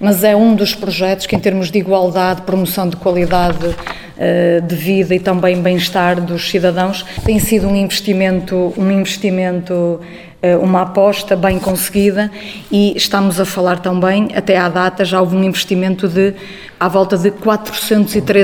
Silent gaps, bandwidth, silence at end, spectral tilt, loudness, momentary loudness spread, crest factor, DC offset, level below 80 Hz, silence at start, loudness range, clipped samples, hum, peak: none; 18 kHz; 0 s; -5.5 dB/octave; -14 LUFS; 5 LU; 14 dB; under 0.1%; -36 dBFS; 0 s; 1 LU; under 0.1%; none; 0 dBFS